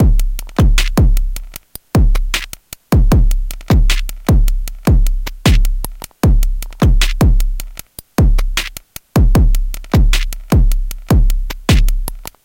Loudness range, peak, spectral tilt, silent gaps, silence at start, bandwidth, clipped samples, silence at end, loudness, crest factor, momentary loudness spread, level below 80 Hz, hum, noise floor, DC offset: 1 LU; 0 dBFS; -5.5 dB/octave; none; 0 s; 17 kHz; under 0.1%; 0.2 s; -16 LUFS; 12 dB; 12 LU; -14 dBFS; none; -34 dBFS; under 0.1%